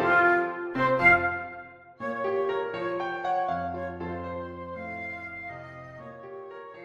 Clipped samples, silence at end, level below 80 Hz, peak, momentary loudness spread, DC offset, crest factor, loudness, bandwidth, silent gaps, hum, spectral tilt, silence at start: under 0.1%; 0 s; -56 dBFS; -8 dBFS; 22 LU; under 0.1%; 22 dB; -27 LUFS; 11.5 kHz; none; none; -7 dB/octave; 0 s